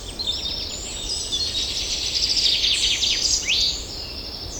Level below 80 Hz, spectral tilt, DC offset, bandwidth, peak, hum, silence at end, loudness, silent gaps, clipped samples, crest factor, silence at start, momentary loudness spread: -40 dBFS; 0 dB/octave; under 0.1%; 19.5 kHz; -8 dBFS; none; 0 s; -21 LUFS; none; under 0.1%; 16 dB; 0 s; 11 LU